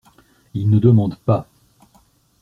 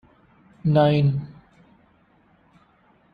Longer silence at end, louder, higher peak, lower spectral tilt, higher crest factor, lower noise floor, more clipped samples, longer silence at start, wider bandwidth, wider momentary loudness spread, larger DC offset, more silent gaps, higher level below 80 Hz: second, 1 s vs 1.8 s; first, -17 LUFS vs -21 LUFS; first, 0 dBFS vs -6 dBFS; about the same, -11 dB/octave vs -10 dB/octave; about the same, 18 dB vs 20 dB; about the same, -56 dBFS vs -59 dBFS; neither; about the same, 0.55 s vs 0.65 s; second, 4.5 kHz vs 5 kHz; second, 10 LU vs 14 LU; neither; neither; first, -52 dBFS vs -58 dBFS